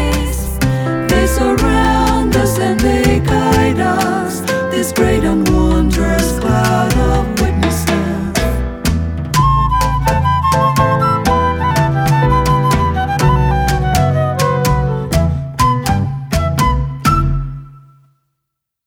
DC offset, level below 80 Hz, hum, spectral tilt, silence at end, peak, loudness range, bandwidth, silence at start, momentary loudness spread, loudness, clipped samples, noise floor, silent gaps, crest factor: under 0.1%; -22 dBFS; none; -6 dB/octave; 1.1 s; 0 dBFS; 2 LU; 18.5 kHz; 0 s; 5 LU; -14 LUFS; under 0.1%; -76 dBFS; none; 12 dB